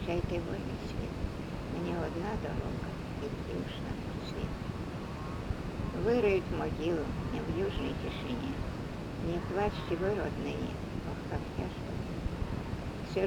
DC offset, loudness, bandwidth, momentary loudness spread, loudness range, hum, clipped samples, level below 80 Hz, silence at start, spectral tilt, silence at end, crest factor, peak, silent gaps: under 0.1%; -36 LUFS; 19 kHz; 7 LU; 4 LU; none; under 0.1%; -44 dBFS; 0 s; -7 dB/octave; 0 s; 18 dB; -16 dBFS; none